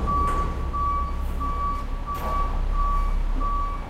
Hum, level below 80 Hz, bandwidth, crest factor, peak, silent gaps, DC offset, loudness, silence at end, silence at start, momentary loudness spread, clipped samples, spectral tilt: none; -26 dBFS; 13.5 kHz; 12 dB; -12 dBFS; none; under 0.1%; -27 LUFS; 0 s; 0 s; 5 LU; under 0.1%; -7 dB/octave